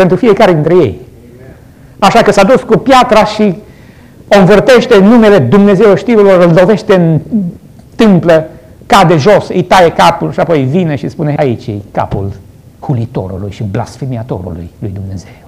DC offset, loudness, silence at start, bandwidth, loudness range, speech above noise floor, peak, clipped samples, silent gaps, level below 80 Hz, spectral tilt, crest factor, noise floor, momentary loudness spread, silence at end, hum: under 0.1%; -8 LUFS; 0 s; 15.5 kHz; 10 LU; 28 dB; 0 dBFS; under 0.1%; none; -36 dBFS; -6.5 dB/octave; 8 dB; -35 dBFS; 15 LU; 0.15 s; none